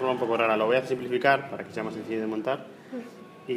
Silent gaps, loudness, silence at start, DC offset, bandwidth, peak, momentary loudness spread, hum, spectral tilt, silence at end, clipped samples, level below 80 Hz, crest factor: none; -27 LUFS; 0 s; under 0.1%; 15 kHz; -6 dBFS; 16 LU; none; -6 dB/octave; 0 s; under 0.1%; -74 dBFS; 22 dB